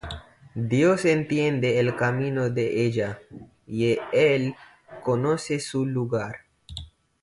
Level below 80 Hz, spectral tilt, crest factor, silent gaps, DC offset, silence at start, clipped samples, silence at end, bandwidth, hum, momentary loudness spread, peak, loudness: -52 dBFS; -6.5 dB/octave; 16 dB; none; under 0.1%; 0.05 s; under 0.1%; 0.35 s; 11.5 kHz; none; 19 LU; -8 dBFS; -24 LUFS